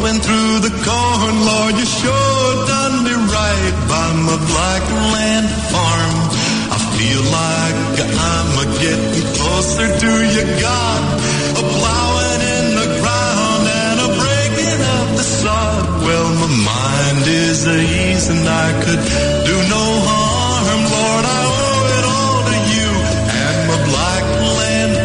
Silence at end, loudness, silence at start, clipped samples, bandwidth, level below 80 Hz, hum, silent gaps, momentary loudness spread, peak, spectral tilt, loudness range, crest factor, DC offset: 0 s; -14 LUFS; 0 s; under 0.1%; 11 kHz; -30 dBFS; none; none; 2 LU; -2 dBFS; -4 dB/octave; 1 LU; 12 dB; under 0.1%